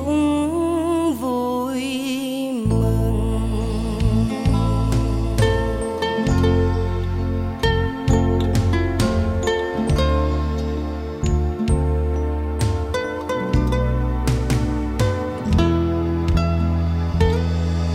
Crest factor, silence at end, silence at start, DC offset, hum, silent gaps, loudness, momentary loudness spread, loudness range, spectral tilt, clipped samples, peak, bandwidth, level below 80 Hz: 14 dB; 0 s; 0 s; under 0.1%; none; none; -21 LUFS; 5 LU; 2 LU; -7 dB/octave; under 0.1%; -4 dBFS; 15.5 kHz; -26 dBFS